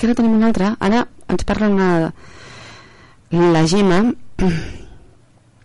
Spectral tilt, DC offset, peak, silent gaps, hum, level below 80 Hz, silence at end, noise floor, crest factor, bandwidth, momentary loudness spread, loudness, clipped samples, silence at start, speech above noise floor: -6.5 dB/octave; under 0.1%; -6 dBFS; none; none; -34 dBFS; 0.85 s; -50 dBFS; 10 dB; 11.5 kHz; 12 LU; -17 LUFS; under 0.1%; 0 s; 35 dB